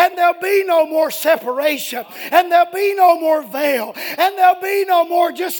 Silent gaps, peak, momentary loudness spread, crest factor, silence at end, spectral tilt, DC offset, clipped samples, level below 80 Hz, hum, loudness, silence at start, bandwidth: none; 0 dBFS; 6 LU; 16 dB; 0 s; -2 dB/octave; under 0.1%; under 0.1%; -70 dBFS; none; -16 LUFS; 0 s; 19.5 kHz